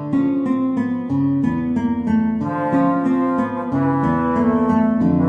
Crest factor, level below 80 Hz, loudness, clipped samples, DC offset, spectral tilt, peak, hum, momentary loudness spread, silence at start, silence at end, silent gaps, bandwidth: 12 dB; -46 dBFS; -19 LUFS; under 0.1%; under 0.1%; -10 dB/octave; -6 dBFS; none; 4 LU; 0 s; 0 s; none; 4.7 kHz